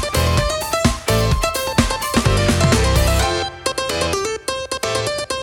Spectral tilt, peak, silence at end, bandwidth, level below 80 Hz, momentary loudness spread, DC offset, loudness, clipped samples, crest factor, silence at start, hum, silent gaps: -4.5 dB/octave; 0 dBFS; 0 s; 19 kHz; -26 dBFS; 7 LU; under 0.1%; -18 LUFS; under 0.1%; 16 dB; 0 s; none; none